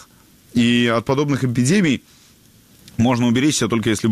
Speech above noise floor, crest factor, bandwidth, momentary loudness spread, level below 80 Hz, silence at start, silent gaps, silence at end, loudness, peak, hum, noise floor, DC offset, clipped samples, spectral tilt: 34 dB; 12 dB; 15 kHz; 5 LU; -50 dBFS; 0.55 s; none; 0 s; -18 LUFS; -6 dBFS; none; -50 dBFS; under 0.1%; under 0.1%; -5 dB/octave